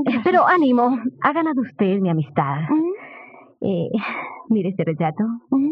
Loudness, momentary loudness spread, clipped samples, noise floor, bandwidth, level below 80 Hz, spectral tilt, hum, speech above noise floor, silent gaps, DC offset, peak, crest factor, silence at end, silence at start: -20 LUFS; 11 LU; under 0.1%; -43 dBFS; 5.4 kHz; -66 dBFS; -10 dB/octave; none; 24 dB; none; under 0.1%; -4 dBFS; 16 dB; 0 s; 0 s